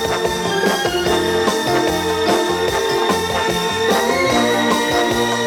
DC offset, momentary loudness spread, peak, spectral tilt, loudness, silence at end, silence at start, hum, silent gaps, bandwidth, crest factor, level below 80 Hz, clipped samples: under 0.1%; 2 LU; -2 dBFS; -3.5 dB/octave; -17 LUFS; 0 s; 0 s; none; none; 19.5 kHz; 16 dB; -42 dBFS; under 0.1%